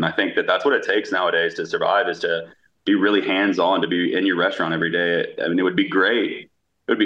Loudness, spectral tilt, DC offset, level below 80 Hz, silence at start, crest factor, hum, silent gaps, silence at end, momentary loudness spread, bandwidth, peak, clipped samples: -20 LUFS; -5.5 dB/octave; under 0.1%; -68 dBFS; 0 s; 16 dB; none; none; 0 s; 6 LU; 7.6 kHz; -4 dBFS; under 0.1%